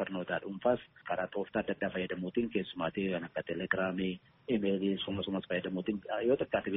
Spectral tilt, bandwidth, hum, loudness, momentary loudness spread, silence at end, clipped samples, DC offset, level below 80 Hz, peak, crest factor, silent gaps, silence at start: -4.5 dB/octave; 4 kHz; none; -35 LUFS; 6 LU; 0 s; under 0.1%; under 0.1%; -66 dBFS; -14 dBFS; 20 dB; none; 0 s